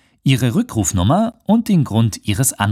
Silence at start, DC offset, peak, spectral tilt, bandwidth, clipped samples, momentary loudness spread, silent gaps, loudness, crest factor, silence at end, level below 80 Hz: 0.25 s; under 0.1%; 0 dBFS; -5.5 dB/octave; 16 kHz; under 0.1%; 3 LU; none; -17 LUFS; 16 dB; 0 s; -44 dBFS